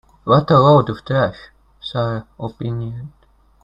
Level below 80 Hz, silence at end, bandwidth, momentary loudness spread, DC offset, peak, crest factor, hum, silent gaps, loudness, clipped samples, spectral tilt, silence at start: -48 dBFS; 0.55 s; 7.2 kHz; 20 LU; under 0.1%; 0 dBFS; 18 dB; none; none; -17 LUFS; under 0.1%; -9 dB/octave; 0.25 s